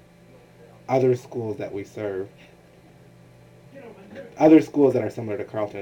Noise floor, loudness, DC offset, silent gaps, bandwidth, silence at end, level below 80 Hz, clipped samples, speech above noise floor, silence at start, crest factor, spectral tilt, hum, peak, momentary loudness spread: -51 dBFS; -22 LUFS; under 0.1%; none; 9.4 kHz; 0 s; -64 dBFS; under 0.1%; 29 dB; 0.9 s; 20 dB; -8 dB/octave; none; -4 dBFS; 26 LU